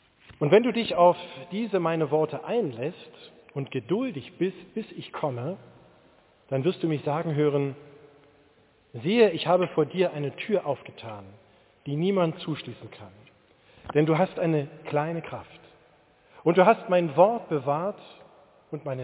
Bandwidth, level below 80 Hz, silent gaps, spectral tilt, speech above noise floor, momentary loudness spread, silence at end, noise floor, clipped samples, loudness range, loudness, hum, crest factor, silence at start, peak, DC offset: 4 kHz; -68 dBFS; none; -10.5 dB/octave; 35 dB; 20 LU; 0 s; -61 dBFS; under 0.1%; 7 LU; -26 LUFS; none; 22 dB; 0.3 s; -4 dBFS; under 0.1%